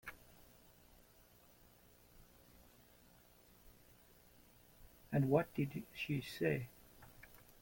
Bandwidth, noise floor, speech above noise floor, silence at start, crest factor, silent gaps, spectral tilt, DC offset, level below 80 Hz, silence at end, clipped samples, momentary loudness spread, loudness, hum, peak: 17 kHz; -67 dBFS; 28 dB; 0.05 s; 26 dB; none; -7 dB/octave; under 0.1%; -70 dBFS; 0.25 s; under 0.1%; 29 LU; -40 LUFS; 60 Hz at -70 dBFS; -20 dBFS